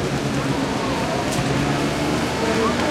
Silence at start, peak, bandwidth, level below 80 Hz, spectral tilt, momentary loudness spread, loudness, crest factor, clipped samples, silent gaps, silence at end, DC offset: 0 s; -6 dBFS; 16 kHz; -38 dBFS; -5 dB/octave; 3 LU; -21 LUFS; 14 dB; under 0.1%; none; 0 s; under 0.1%